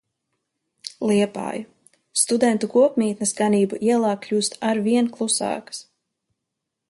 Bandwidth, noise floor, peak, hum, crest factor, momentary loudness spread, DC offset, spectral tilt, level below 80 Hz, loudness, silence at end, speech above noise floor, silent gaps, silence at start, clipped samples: 11.5 kHz; -81 dBFS; -4 dBFS; none; 18 dB; 12 LU; under 0.1%; -4 dB/octave; -68 dBFS; -21 LUFS; 1.1 s; 61 dB; none; 0.85 s; under 0.1%